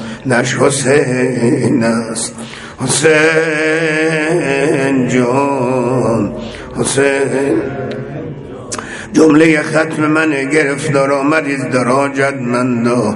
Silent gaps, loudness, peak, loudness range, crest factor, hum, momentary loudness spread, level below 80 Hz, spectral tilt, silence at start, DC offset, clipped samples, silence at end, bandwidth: none; -13 LUFS; 0 dBFS; 3 LU; 14 dB; none; 13 LU; -46 dBFS; -5 dB/octave; 0 s; under 0.1%; under 0.1%; 0 s; 11.5 kHz